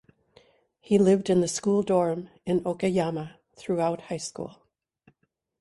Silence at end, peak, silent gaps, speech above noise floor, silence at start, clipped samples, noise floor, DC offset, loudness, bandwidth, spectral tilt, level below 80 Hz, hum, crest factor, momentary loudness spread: 1.1 s; -8 dBFS; none; 49 dB; 0.9 s; under 0.1%; -74 dBFS; under 0.1%; -26 LUFS; 11.5 kHz; -6 dB/octave; -64 dBFS; none; 18 dB; 16 LU